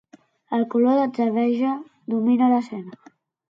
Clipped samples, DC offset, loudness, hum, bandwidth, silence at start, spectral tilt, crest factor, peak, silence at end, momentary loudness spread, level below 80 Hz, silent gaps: under 0.1%; under 0.1%; -21 LUFS; none; 5.8 kHz; 0.5 s; -8 dB/octave; 14 dB; -8 dBFS; 0.55 s; 14 LU; -74 dBFS; none